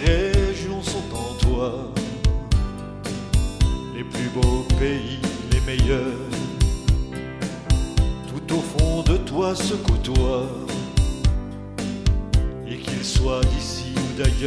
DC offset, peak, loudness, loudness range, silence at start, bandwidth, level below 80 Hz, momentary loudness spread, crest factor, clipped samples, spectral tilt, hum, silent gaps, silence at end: under 0.1%; -4 dBFS; -24 LUFS; 2 LU; 0 s; 11 kHz; -24 dBFS; 9 LU; 18 dB; under 0.1%; -5.5 dB/octave; none; none; 0 s